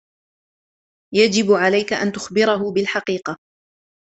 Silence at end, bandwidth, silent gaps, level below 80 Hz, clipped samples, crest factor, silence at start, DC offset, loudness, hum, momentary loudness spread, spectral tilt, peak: 0.75 s; 8.2 kHz; none; -62 dBFS; under 0.1%; 20 dB; 1.1 s; under 0.1%; -18 LUFS; none; 10 LU; -4 dB/octave; -2 dBFS